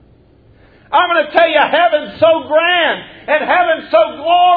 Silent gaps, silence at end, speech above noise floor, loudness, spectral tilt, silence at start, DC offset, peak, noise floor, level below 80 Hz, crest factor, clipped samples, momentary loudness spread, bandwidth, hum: none; 0 s; 35 dB; -13 LUFS; -6 dB/octave; 0.9 s; under 0.1%; 0 dBFS; -47 dBFS; -52 dBFS; 14 dB; under 0.1%; 5 LU; 4.9 kHz; none